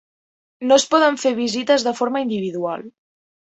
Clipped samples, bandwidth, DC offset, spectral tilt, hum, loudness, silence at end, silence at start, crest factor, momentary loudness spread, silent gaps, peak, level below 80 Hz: under 0.1%; 8.2 kHz; under 0.1%; -3 dB/octave; none; -19 LUFS; 0.55 s; 0.6 s; 18 dB; 12 LU; none; -2 dBFS; -64 dBFS